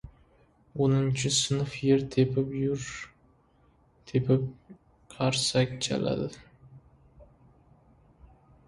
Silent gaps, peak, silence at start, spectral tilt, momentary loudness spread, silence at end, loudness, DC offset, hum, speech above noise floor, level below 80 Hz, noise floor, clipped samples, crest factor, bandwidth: none; -12 dBFS; 0.05 s; -5 dB/octave; 13 LU; 1.45 s; -28 LUFS; under 0.1%; none; 36 dB; -56 dBFS; -63 dBFS; under 0.1%; 20 dB; 11.5 kHz